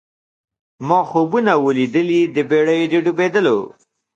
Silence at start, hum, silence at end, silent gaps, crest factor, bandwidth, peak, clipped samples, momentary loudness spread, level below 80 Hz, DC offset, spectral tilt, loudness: 0.8 s; none; 0.45 s; none; 16 dB; 7.8 kHz; -2 dBFS; under 0.1%; 3 LU; -66 dBFS; under 0.1%; -6.5 dB/octave; -16 LUFS